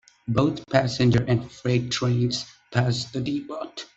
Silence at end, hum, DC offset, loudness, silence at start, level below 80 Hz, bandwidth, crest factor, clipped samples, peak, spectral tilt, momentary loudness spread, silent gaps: 0.1 s; none; under 0.1%; -24 LUFS; 0.25 s; -52 dBFS; 8 kHz; 20 dB; under 0.1%; -4 dBFS; -6 dB/octave; 9 LU; none